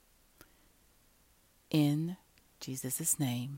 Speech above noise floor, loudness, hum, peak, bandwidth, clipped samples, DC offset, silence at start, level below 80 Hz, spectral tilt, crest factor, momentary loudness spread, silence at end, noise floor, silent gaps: 35 dB; -33 LUFS; none; -18 dBFS; 16 kHz; under 0.1%; under 0.1%; 1.7 s; -70 dBFS; -4.5 dB/octave; 20 dB; 15 LU; 0 s; -67 dBFS; none